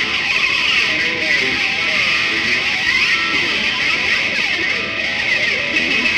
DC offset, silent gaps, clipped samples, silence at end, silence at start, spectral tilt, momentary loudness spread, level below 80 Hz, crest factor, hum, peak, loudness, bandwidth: under 0.1%; none; under 0.1%; 0 s; 0 s; -1.5 dB/octave; 2 LU; -48 dBFS; 14 dB; none; -2 dBFS; -14 LUFS; 16 kHz